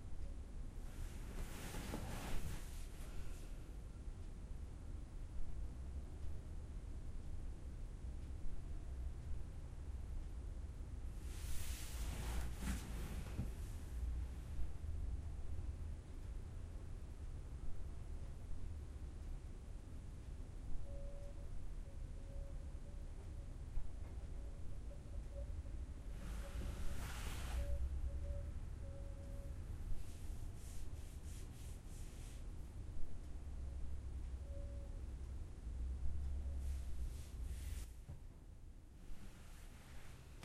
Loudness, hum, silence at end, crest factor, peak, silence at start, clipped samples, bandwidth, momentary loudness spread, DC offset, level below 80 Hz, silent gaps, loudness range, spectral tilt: -51 LUFS; none; 0 s; 16 dB; -28 dBFS; 0 s; under 0.1%; 16 kHz; 7 LU; under 0.1%; -48 dBFS; none; 5 LU; -5.5 dB/octave